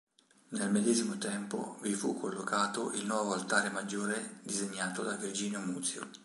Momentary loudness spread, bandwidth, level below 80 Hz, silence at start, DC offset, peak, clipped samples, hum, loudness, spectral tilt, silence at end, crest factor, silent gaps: 7 LU; 11.5 kHz; -80 dBFS; 0.5 s; under 0.1%; -14 dBFS; under 0.1%; none; -34 LUFS; -3.5 dB/octave; 0 s; 22 dB; none